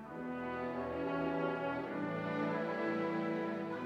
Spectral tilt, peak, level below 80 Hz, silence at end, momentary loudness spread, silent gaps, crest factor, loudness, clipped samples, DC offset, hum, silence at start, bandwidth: -8 dB/octave; -24 dBFS; -68 dBFS; 0 s; 4 LU; none; 14 dB; -38 LUFS; under 0.1%; under 0.1%; none; 0 s; 9 kHz